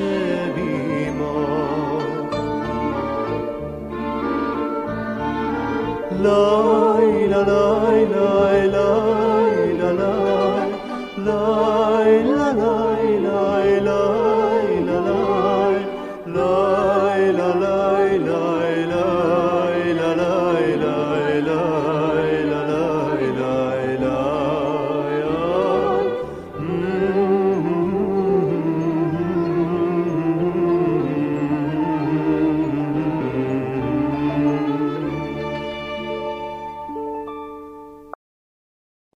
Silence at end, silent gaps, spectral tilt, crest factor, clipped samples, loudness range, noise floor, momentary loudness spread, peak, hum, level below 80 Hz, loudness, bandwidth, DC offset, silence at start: 1 s; none; -7.5 dB/octave; 16 dB; under 0.1%; 7 LU; under -90 dBFS; 10 LU; -4 dBFS; none; -46 dBFS; -20 LUFS; 10.5 kHz; under 0.1%; 0 s